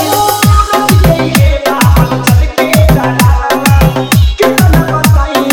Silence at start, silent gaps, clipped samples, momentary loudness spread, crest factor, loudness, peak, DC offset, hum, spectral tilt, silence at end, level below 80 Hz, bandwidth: 0 s; none; 1%; 2 LU; 8 dB; -8 LUFS; 0 dBFS; under 0.1%; none; -5.5 dB/octave; 0 s; -14 dBFS; over 20 kHz